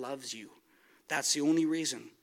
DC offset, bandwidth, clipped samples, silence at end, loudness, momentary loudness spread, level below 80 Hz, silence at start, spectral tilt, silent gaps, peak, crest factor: under 0.1%; 16 kHz; under 0.1%; 0.15 s; -31 LUFS; 13 LU; -88 dBFS; 0 s; -2.5 dB/octave; none; -16 dBFS; 18 dB